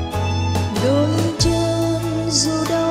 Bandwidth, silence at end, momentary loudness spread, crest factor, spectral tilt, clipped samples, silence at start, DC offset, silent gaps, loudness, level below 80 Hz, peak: 15.5 kHz; 0 s; 4 LU; 16 dB; -5 dB/octave; under 0.1%; 0 s; under 0.1%; none; -19 LUFS; -36 dBFS; -2 dBFS